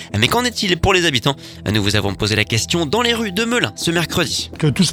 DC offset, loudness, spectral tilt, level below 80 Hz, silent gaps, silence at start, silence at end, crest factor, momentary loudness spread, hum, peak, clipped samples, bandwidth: under 0.1%; -17 LUFS; -4 dB/octave; -38 dBFS; none; 0 s; 0 s; 18 dB; 5 LU; none; 0 dBFS; under 0.1%; 19 kHz